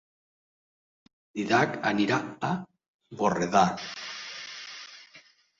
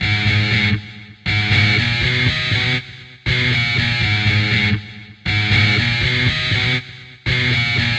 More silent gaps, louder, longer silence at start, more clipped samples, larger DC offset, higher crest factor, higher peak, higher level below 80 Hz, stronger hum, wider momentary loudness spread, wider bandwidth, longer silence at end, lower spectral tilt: first, 2.88-2.99 s vs none; second, -28 LUFS vs -16 LUFS; first, 1.35 s vs 0 s; neither; neither; first, 22 dB vs 16 dB; second, -8 dBFS vs -2 dBFS; second, -66 dBFS vs -36 dBFS; neither; first, 17 LU vs 11 LU; about the same, 7.8 kHz vs 8.4 kHz; first, 0.4 s vs 0 s; about the same, -5 dB/octave vs -5 dB/octave